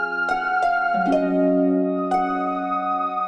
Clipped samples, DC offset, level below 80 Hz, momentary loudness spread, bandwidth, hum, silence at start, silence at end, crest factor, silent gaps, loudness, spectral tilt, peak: under 0.1%; under 0.1%; -54 dBFS; 4 LU; 9 kHz; none; 0 s; 0 s; 12 dB; none; -21 LUFS; -7.5 dB/octave; -10 dBFS